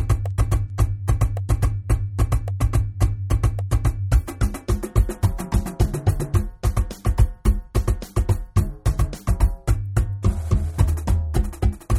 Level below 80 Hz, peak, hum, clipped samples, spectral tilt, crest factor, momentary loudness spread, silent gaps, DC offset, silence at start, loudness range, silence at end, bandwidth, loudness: -24 dBFS; -4 dBFS; none; under 0.1%; -7 dB/octave; 16 dB; 3 LU; none; under 0.1%; 0 s; 1 LU; 0 s; 14.5 kHz; -23 LUFS